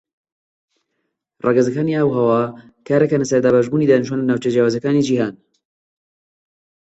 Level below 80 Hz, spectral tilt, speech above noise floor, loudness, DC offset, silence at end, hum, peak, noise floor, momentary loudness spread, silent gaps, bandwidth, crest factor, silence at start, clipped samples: -60 dBFS; -7 dB/octave; 58 dB; -17 LUFS; under 0.1%; 1.55 s; none; -2 dBFS; -74 dBFS; 5 LU; none; 8.2 kHz; 16 dB; 1.45 s; under 0.1%